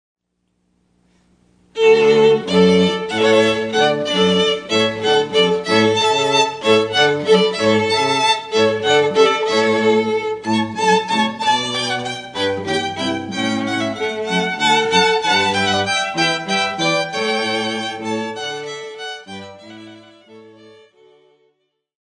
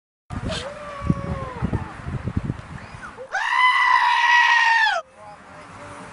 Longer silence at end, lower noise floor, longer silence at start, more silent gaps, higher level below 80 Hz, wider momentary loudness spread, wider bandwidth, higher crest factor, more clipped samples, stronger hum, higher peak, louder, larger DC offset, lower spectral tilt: first, 1.6 s vs 0 s; first, -68 dBFS vs -43 dBFS; first, 1.75 s vs 0.3 s; neither; second, -60 dBFS vs -40 dBFS; second, 10 LU vs 22 LU; about the same, 10 kHz vs 11 kHz; about the same, 18 dB vs 18 dB; neither; neither; first, 0 dBFS vs -4 dBFS; first, -16 LUFS vs -19 LUFS; neither; about the same, -4 dB/octave vs -4 dB/octave